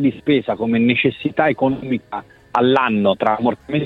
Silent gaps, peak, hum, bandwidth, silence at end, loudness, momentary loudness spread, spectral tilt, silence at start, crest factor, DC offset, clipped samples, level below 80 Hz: none; -2 dBFS; none; 6.4 kHz; 0 s; -18 LUFS; 9 LU; -8 dB/octave; 0 s; 16 dB; under 0.1%; under 0.1%; -54 dBFS